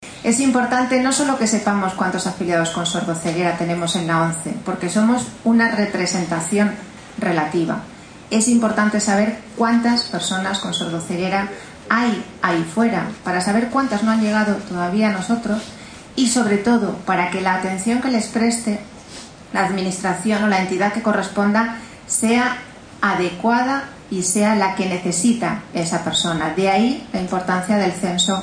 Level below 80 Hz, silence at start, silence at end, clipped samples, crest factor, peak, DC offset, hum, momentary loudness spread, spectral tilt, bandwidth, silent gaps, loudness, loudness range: -52 dBFS; 0 s; 0 s; under 0.1%; 18 dB; 0 dBFS; under 0.1%; none; 8 LU; -4 dB/octave; 10.5 kHz; none; -19 LUFS; 2 LU